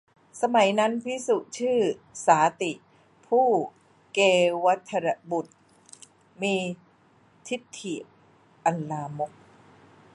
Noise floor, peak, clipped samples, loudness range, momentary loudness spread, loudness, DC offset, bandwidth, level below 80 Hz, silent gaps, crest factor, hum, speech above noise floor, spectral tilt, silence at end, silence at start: -60 dBFS; -6 dBFS; under 0.1%; 10 LU; 14 LU; -26 LUFS; under 0.1%; 11.5 kHz; -76 dBFS; none; 22 dB; none; 35 dB; -4.5 dB/octave; 0.85 s; 0.35 s